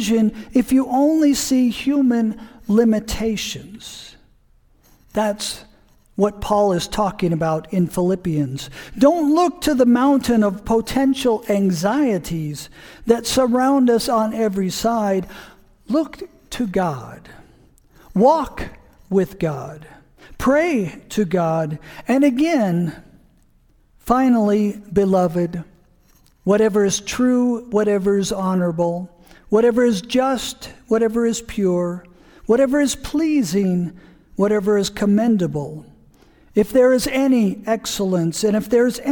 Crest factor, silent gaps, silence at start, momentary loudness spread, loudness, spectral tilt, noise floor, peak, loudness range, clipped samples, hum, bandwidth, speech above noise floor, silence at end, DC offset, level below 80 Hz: 18 dB; none; 0 s; 13 LU; -19 LUFS; -5.5 dB/octave; -55 dBFS; -2 dBFS; 5 LU; under 0.1%; none; 19 kHz; 37 dB; 0 s; under 0.1%; -44 dBFS